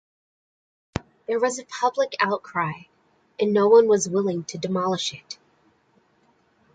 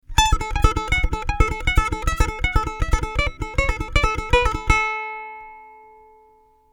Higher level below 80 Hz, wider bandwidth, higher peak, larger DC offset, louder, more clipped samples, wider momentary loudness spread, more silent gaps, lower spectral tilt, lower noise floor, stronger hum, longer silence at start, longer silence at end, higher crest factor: second, -58 dBFS vs -24 dBFS; second, 9.2 kHz vs 17.5 kHz; second, -6 dBFS vs -2 dBFS; neither; about the same, -23 LUFS vs -22 LUFS; neither; first, 19 LU vs 8 LU; neither; about the same, -4.5 dB/octave vs -4 dB/octave; first, -63 dBFS vs -55 dBFS; neither; first, 0.95 s vs 0.1 s; first, 1.4 s vs 1 s; about the same, 20 dB vs 20 dB